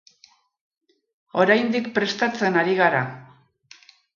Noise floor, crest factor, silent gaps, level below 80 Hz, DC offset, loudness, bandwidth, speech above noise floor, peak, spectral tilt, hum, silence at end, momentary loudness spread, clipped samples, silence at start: -58 dBFS; 20 dB; none; -72 dBFS; under 0.1%; -21 LUFS; 7.4 kHz; 37 dB; -4 dBFS; -5.5 dB/octave; none; 0.95 s; 7 LU; under 0.1%; 1.35 s